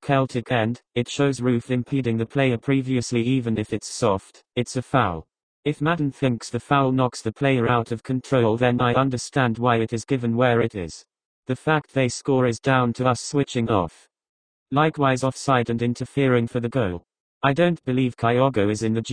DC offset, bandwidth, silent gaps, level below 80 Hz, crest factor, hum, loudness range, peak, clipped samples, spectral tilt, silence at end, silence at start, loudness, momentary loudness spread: under 0.1%; 10 kHz; 5.43-5.63 s, 11.25-11.43 s, 14.29-14.66 s, 17.20-17.41 s; -52 dBFS; 20 dB; none; 2 LU; -2 dBFS; under 0.1%; -6 dB/octave; 0 s; 0 s; -22 LUFS; 7 LU